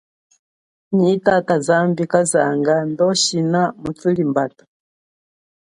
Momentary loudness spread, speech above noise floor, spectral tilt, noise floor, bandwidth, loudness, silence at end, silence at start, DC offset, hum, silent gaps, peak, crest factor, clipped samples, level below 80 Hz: 6 LU; over 73 dB; -4.5 dB/octave; under -90 dBFS; 11.5 kHz; -17 LUFS; 1.3 s; 0.9 s; under 0.1%; none; none; 0 dBFS; 18 dB; under 0.1%; -58 dBFS